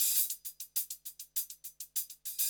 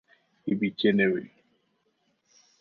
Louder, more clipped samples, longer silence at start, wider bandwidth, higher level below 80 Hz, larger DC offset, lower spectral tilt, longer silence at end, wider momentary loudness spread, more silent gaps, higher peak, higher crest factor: second, -35 LUFS vs -26 LUFS; neither; second, 0 s vs 0.45 s; first, over 20 kHz vs 6.2 kHz; second, -82 dBFS vs -70 dBFS; neither; second, 4.5 dB/octave vs -7.5 dB/octave; second, 0 s vs 1.35 s; about the same, 13 LU vs 11 LU; neither; second, -16 dBFS vs -10 dBFS; about the same, 20 dB vs 20 dB